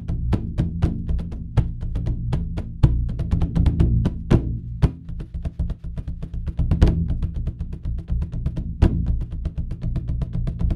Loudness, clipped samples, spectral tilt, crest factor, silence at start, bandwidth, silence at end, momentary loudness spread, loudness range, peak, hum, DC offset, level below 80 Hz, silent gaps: -25 LUFS; under 0.1%; -9 dB/octave; 22 dB; 0 s; 6.8 kHz; 0 s; 11 LU; 4 LU; 0 dBFS; none; under 0.1%; -26 dBFS; none